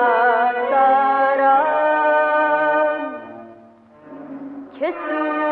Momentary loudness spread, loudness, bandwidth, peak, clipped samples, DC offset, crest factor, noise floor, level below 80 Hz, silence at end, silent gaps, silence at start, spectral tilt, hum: 19 LU; -17 LUFS; 4.6 kHz; -6 dBFS; under 0.1%; under 0.1%; 14 dB; -46 dBFS; -70 dBFS; 0 s; none; 0 s; -6.5 dB/octave; 50 Hz at -70 dBFS